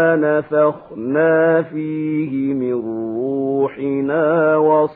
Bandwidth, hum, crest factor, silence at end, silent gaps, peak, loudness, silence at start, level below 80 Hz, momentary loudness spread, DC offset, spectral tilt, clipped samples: 4 kHz; none; 14 dB; 0 s; none; -4 dBFS; -18 LUFS; 0 s; -62 dBFS; 8 LU; under 0.1%; -12 dB/octave; under 0.1%